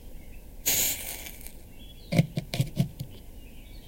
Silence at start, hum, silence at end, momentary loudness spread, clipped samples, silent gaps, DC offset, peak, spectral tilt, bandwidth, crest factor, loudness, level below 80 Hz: 0 s; none; 0 s; 24 LU; under 0.1%; none; under 0.1%; -8 dBFS; -3.5 dB/octave; 17 kHz; 24 dB; -28 LUFS; -46 dBFS